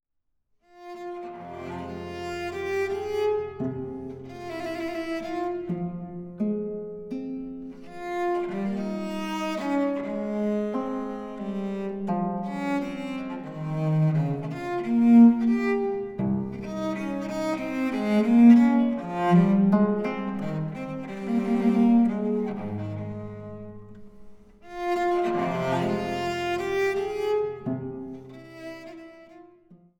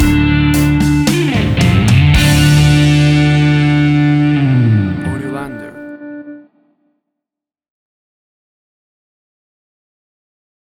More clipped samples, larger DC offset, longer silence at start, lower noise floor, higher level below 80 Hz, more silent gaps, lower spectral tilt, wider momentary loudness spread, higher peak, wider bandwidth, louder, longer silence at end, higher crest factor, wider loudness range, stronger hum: neither; neither; first, 0.75 s vs 0 s; second, -74 dBFS vs -84 dBFS; second, -58 dBFS vs -26 dBFS; neither; first, -8 dB/octave vs -6 dB/octave; about the same, 18 LU vs 19 LU; second, -6 dBFS vs 0 dBFS; second, 9 kHz vs 19 kHz; second, -26 LUFS vs -11 LUFS; second, 0.25 s vs 4.3 s; first, 20 dB vs 12 dB; second, 10 LU vs 16 LU; neither